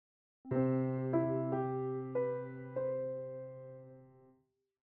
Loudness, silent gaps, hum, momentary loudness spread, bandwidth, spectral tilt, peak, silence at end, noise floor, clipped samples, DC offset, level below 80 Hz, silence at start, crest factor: -37 LUFS; none; none; 16 LU; 3.3 kHz; -11 dB/octave; -20 dBFS; 0.7 s; -76 dBFS; under 0.1%; under 0.1%; -76 dBFS; 0.45 s; 18 dB